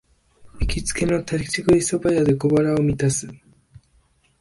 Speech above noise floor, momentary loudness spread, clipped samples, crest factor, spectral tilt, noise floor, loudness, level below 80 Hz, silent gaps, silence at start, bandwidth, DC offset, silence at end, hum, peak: 41 dB; 9 LU; under 0.1%; 16 dB; -5.5 dB/octave; -60 dBFS; -21 LUFS; -36 dBFS; none; 0.45 s; 11.5 kHz; under 0.1%; 1.05 s; none; -6 dBFS